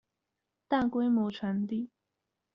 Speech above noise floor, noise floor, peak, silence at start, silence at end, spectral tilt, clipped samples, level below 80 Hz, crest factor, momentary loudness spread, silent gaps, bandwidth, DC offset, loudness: 56 dB; -86 dBFS; -16 dBFS; 0.7 s; 0.7 s; -5.5 dB/octave; under 0.1%; -66 dBFS; 18 dB; 8 LU; none; 5.8 kHz; under 0.1%; -31 LUFS